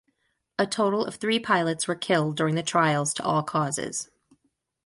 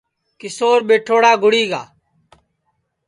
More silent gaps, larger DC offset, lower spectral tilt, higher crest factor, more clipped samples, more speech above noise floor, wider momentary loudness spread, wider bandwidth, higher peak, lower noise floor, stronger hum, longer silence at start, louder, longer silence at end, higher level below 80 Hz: neither; neither; about the same, -4 dB/octave vs -3 dB/octave; about the same, 18 dB vs 18 dB; neither; second, 48 dB vs 55 dB; second, 7 LU vs 17 LU; about the same, 11.5 kHz vs 11 kHz; second, -8 dBFS vs 0 dBFS; first, -73 dBFS vs -69 dBFS; neither; first, 0.6 s vs 0.45 s; second, -25 LUFS vs -15 LUFS; second, 0.8 s vs 1.25 s; about the same, -68 dBFS vs -68 dBFS